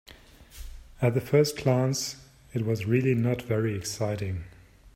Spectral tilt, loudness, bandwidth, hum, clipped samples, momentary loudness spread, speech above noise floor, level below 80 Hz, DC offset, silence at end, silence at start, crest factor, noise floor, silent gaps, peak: -6 dB/octave; -27 LUFS; 16 kHz; none; under 0.1%; 23 LU; 25 dB; -52 dBFS; under 0.1%; 0.05 s; 0.4 s; 20 dB; -51 dBFS; none; -8 dBFS